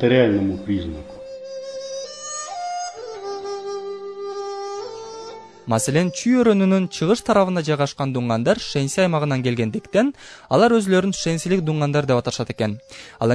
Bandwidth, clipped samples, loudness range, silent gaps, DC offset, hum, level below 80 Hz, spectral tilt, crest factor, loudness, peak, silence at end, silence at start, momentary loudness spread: 11 kHz; under 0.1%; 11 LU; none; under 0.1%; none; -52 dBFS; -5.5 dB/octave; 20 dB; -21 LUFS; -2 dBFS; 0 s; 0 s; 17 LU